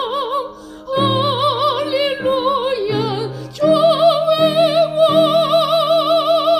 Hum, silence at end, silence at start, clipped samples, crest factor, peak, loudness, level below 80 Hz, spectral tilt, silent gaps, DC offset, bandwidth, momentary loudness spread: none; 0 s; 0 s; under 0.1%; 14 dB; -2 dBFS; -15 LUFS; -54 dBFS; -5.5 dB/octave; none; under 0.1%; 15 kHz; 9 LU